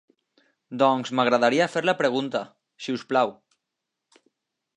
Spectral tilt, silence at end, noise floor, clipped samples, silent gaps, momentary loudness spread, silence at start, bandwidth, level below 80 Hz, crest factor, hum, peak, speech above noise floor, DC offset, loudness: -5 dB/octave; 1.45 s; -84 dBFS; under 0.1%; none; 13 LU; 0.7 s; 11 kHz; -80 dBFS; 20 dB; none; -6 dBFS; 61 dB; under 0.1%; -23 LUFS